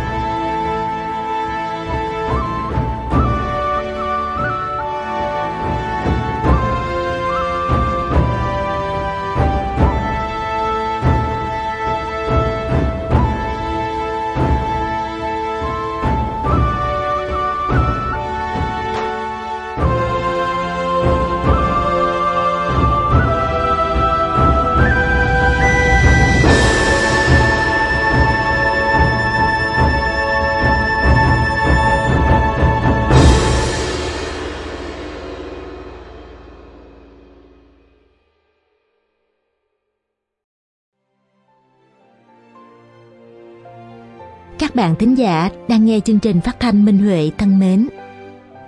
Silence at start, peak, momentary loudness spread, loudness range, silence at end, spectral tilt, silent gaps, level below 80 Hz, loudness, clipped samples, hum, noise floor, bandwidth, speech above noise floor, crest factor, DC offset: 0 s; 0 dBFS; 9 LU; 7 LU; 0 s; -6 dB/octave; 40.44-40.92 s; -24 dBFS; -16 LUFS; under 0.1%; none; -77 dBFS; 11 kHz; 64 dB; 16 dB; under 0.1%